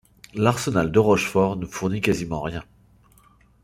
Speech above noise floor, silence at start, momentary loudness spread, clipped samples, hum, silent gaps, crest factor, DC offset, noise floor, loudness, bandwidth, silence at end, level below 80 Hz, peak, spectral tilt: 34 dB; 0.35 s; 12 LU; under 0.1%; none; none; 20 dB; under 0.1%; -56 dBFS; -22 LUFS; 16.5 kHz; 1 s; -48 dBFS; -2 dBFS; -6 dB/octave